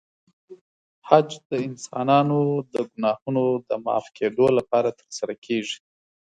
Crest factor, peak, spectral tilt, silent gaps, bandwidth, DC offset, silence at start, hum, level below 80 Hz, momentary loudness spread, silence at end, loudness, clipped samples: 24 dB; 0 dBFS; -6 dB/octave; 0.61-1.02 s, 1.45-1.50 s, 3.22-3.26 s, 5.38-5.42 s; 10 kHz; under 0.1%; 0.5 s; none; -68 dBFS; 12 LU; 0.6 s; -23 LUFS; under 0.1%